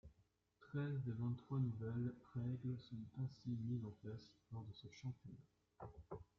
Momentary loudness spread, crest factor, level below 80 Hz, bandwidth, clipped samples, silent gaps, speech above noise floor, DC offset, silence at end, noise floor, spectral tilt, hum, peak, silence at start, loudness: 14 LU; 16 dB; -74 dBFS; 6.6 kHz; under 0.1%; none; 32 dB; under 0.1%; 0.15 s; -79 dBFS; -8.5 dB/octave; none; -32 dBFS; 0.05 s; -48 LUFS